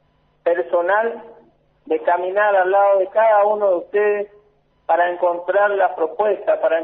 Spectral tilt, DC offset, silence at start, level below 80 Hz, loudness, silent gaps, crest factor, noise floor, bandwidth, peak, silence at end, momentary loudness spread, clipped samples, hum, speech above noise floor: -1.5 dB/octave; under 0.1%; 0.45 s; -68 dBFS; -18 LUFS; none; 14 dB; -57 dBFS; 3.9 kHz; -6 dBFS; 0 s; 10 LU; under 0.1%; none; 40 dB